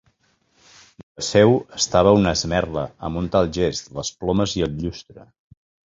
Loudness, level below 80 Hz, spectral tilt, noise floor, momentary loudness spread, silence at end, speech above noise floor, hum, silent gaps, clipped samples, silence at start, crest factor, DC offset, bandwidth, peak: -20 LUFS; -42 dBFS; -5 dB/octave; -64 dBFS; 13 LU; 0.75 s; 44 dB; none; none; under 0.1%; 1.2 s; 20 dB; under 0.1%; 7.8 kHz; -2 dBFS